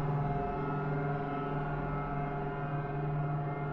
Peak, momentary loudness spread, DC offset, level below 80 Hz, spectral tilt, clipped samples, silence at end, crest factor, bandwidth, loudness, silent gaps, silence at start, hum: -22 dBFS; 2 LU; under 0.1%; -48 dBFS; -10.5 dB/octave; under 0.1%; 0 s; 12 dB; 4.3 kHz; -35 LUFS; none; 0 s; none